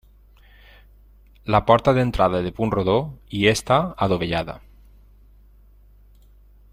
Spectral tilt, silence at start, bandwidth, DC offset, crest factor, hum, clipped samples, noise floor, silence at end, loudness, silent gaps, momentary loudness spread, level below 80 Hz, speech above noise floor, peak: -6 dB/octave; 1.45 s; 16 kHz; under 0.1%; 22 dB; 50 Hz at -45 dBFS; under 0.1%; -51 dBFS; 2.15 s; -20 LUFS; none; 12 LU; -42 dBFS; 31 dB; -2 dBFS